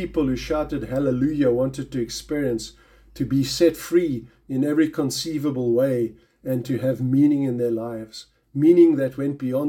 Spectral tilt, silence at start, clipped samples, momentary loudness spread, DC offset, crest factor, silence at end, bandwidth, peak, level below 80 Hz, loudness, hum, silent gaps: -6.5 dB/octave; 0 s; under 0.1%; 12 LU; under 0.1%; 16 dB; 0 s; 17 kHz; -6 dBFS; -48 dBFS; -22 LUFS; none; none